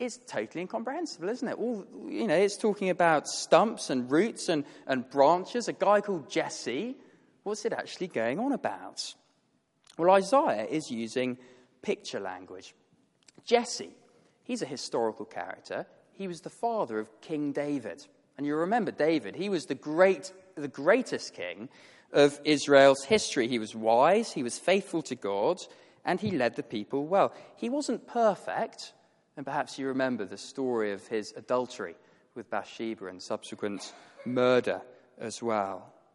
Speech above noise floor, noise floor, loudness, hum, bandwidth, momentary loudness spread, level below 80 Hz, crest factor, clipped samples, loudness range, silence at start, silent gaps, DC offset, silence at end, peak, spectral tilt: 43 dB; -72 dBFS; -29 LUFS; none; 11.5 kHz; 16 LU; -76 dBFS; 24 dB; under 0.1%; 9 LU; 0 s; none; under 0.1%; 0.3 s; -6 dBFS; -4.5 dB/octave